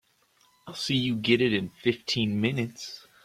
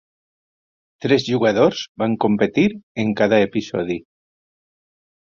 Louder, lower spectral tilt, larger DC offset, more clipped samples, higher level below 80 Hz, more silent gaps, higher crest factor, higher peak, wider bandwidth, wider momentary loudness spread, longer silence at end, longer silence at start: second, -27 LUFS vs -19 LUFS; about the same, -5 dB/octave vs -6 dB/octave; neither; neither; second, -62 dBFS vs -56 dBFS; second, none vs 1.89-1.95 s, 2.83-2.95 s; about the same, 20 dB vs 18 dB; second, -8 dBFS vs -2 dBFS; first, 15 kHz vs 7.4 kHz; first, 14 LU vs 8 LU; second, 0.25 s vs 1.2 s; second, 0.65 s vs 1 s